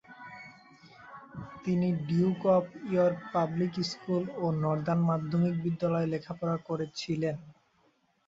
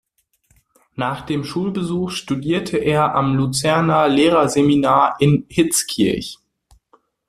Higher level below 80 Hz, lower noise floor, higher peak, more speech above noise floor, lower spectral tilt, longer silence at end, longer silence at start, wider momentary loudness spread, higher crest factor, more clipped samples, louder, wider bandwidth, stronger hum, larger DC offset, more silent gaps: second, -66 dBFS vs -50 dBFS; first, -70 dBFS vs -62 dBFS; second, -14 dBFS vs -2 dBFS; second, 40 dB vs 45 dB; first, -7.5 dB/octave vs -5 dB/octave; second, 0.75 s vs 0.95 s; second, 0.1 s vs 1 s; first, 18 LU vs 10 LU; about the same, 16 dB vs 16 dB; neither; second, -30 LUFS vs -18 LUFS; second, 7.6 kHz vs 14.5 kHz; neither; neither; neither